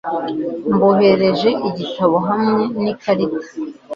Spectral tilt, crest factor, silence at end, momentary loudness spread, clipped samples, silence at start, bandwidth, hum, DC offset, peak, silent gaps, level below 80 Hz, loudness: -7.5 dB/octave; 16 dB; 0 s; 10 LU; under 0.1%; 0.05 s; 7.2 kHz; none; under 0.1%; -2 dBFS; none; -56 dBFS; -17 LUFS